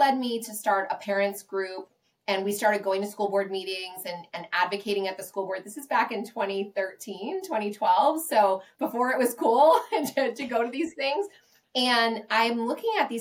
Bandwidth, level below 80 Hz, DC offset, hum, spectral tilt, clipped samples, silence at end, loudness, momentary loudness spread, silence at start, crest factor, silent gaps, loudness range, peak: 17 kHz; -80 dBFS; under 0.1%; none; -3 dB/octave; under 0.1%; 0 s; -26 LUFS; 11 LU; 0 s; 18 dB; none; 6 LU; -8 dBFS